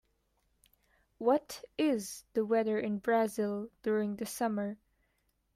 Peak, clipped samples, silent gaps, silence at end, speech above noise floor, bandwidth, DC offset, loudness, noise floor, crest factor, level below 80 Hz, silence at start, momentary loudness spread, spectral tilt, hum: -16 dBFS; under 0.1%; none; 0.8 s; 44 dB; 15.5 kHz; under 0.1%; -33 LUFS; -77 dBFS; 18 dB; -72 dBFS; 1.2 s; 7 LU; -5 dB/octave; none